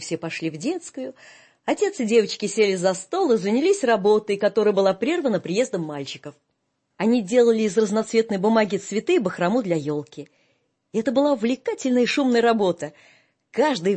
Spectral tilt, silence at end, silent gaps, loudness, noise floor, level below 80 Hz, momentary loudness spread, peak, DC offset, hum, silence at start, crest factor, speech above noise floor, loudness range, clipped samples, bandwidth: -5 dB/octave; 0 s; none; -22 LUFS; -74 dBFS; -70 dBFS; 12 LU; -4 dBFS; under 0.1%; none; 0 s; 18 dB; 52 dB; 3 LU; under 0.1%; 8.8 kHz